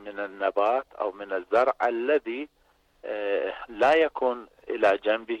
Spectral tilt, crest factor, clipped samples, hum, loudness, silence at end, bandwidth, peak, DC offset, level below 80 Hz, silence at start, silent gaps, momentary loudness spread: -4.5 dB/octave; 14 dB; under 0.1%; none; -26 LUFS; 0 s; 9.2 kHz; -12 dBFS; under 0.1%; -64 dBFS; 0 s; none; 13 LU